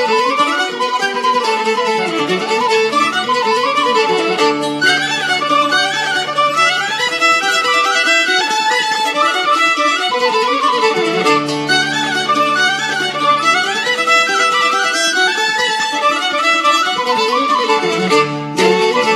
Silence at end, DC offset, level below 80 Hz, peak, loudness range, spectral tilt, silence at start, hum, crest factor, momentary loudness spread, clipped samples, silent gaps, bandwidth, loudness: 0 s; under 0.1%; -70 dBFS; 0 dBFS; 2 LU; -2 dB/octave; 0 s; none; 14 dB; 4 LU; under 0.1%; none; 14 kHz; -13 LUFS